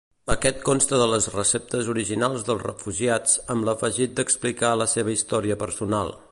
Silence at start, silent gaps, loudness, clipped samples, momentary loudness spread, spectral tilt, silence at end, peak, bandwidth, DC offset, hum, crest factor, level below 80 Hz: 0.25 s; none; -23 LUFS; under 0.1%; 7 LU; -3.5 dB/octave; 0.15 s; -4 dBFS; 11.5 kHz; under 0.1%; none; 20 dB; -44 dBFS